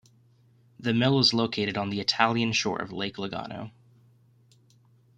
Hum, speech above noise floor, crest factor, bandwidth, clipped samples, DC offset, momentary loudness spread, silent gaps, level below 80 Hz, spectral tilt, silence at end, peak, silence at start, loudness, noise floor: none; 34 dB; 24 dB; 9.4 kHz; under 0.1%; under 0.1%; 14 LU; none; -66 dBFS; -4.5 dB/octave; 1.5 s; -4 dBFS; 0.8 s; -26 LUFS; -61 dBFS